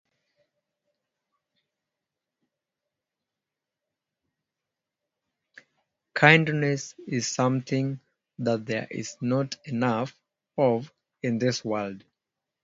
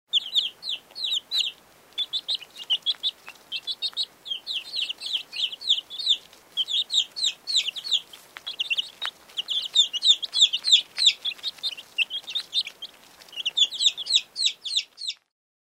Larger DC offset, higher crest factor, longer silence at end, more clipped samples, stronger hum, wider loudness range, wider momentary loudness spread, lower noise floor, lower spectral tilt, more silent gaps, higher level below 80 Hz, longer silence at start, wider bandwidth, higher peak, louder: neither; first, 28 dB vs 22 dB; first, 0.65 s vs 0.5 s; neither; neither; about the same, 5 LU vs 7 LU; about the same, 16 LU vs 14 LU; first, -88 dBFS vs -49 dBFS; first, -5 dB/octave vs 3.5 dB/octave; neither; first, -70 dBFS vs -78 dBFS; first, 6.15 s vs 0.15 s; second, 7.8 kHz vs 16 kHz; first, 0 dBFS vs -6 dBFS; about the same, -26 LUFS vs -24 LUFS